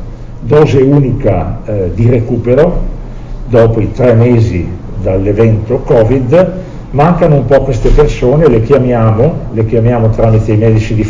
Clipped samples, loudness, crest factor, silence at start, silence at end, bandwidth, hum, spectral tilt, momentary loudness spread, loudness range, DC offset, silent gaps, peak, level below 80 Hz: 3%; -9 LUFS; 8 dB; 0 s; 0 s; 7.6 kHz; none; -9 dB/octave; 10 LU; 2 LU; under 0.1%; none; 0 dBFS; -20 dBFS